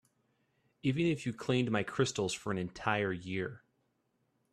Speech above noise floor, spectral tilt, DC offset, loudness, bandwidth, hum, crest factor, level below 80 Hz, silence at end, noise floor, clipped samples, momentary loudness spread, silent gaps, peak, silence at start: 44 dB; -5.5 dB/octave; under 0.1%; -34 LUFS; 13 kHz; none; 22 dB; -68 dBFS; 0.95 s; -78 dBFS; under 0.1%; 6 LU; none; -14 dBFS; 0.85 s